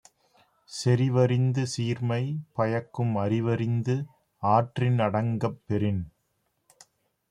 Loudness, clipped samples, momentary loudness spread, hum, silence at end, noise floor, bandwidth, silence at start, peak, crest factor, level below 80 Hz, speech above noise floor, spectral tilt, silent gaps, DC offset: -27 LUFS; under 0.1%; 8 LU; none; 1.2 s; -75 dBFS; 11 kHz; 0.7 s; -8 dBFS; 18 dB; -64 dBFS; 49 dB; -7 dB/octave; none; under 0.1%